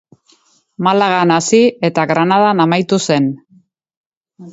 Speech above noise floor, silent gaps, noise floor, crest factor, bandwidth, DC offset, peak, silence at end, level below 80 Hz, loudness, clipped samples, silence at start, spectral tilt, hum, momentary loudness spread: 41 dB; 3.97-4.21 s; -54 dBFS; 14 dB; 8 kHz; under 0.1%; 0 dBFS; 0 s; -60 dBFS; -13 LUFS; under 0.1%; 0.8 s; -5 dB/octave; none; 5 LU